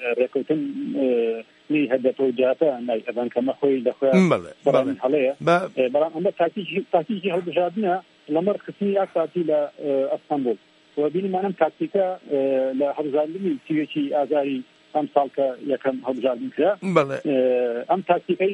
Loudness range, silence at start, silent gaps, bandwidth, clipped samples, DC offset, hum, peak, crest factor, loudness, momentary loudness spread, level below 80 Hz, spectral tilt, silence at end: 3 LU; 0 s; none; 10.5 kHz; under 0.1%; under 0.1%; none; -4 dBFS; 20 dB; -23 LUFS; 5 LU; -74 dBFS; -7.5 dB/octave; 0 s